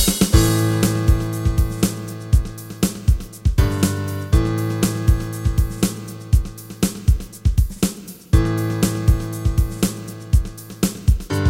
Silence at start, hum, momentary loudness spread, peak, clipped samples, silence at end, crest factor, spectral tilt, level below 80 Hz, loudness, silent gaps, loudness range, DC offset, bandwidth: 0 s; none; 6 LU; 0 dBFS; under 0.1%; 0 s; 18 dB; -5.5 dB/octave; -22 dBFS; -20 LUFS; none; 1 LU; under 0.1%; 16.5 kHz